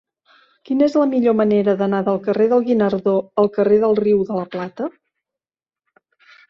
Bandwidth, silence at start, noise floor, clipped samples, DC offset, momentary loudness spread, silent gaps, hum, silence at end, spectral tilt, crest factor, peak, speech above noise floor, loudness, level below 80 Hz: 6.2 kHz; 0.7 s; under -90 dBFS; under 0.1%; under 0.1%; 10 LU; none; none; 1.6 s; -8.5 dB/octave; 14 dB; -4 dBFS; over 73 dB; -18 LUFS; -60 dBFS